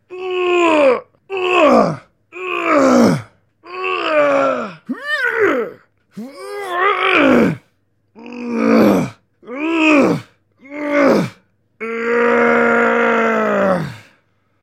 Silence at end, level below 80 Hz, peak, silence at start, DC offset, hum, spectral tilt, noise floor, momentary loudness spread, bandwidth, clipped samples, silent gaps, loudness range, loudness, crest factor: 0.6 s; -56 dBFS; 0 dBFS; 0.1 s; under 0.1%; none; -5.5 dB/octave; -62 dBFS; 17 LU; 15 kHz; under 0.1%; none; 3 LU; -15 LUFS; 16 dB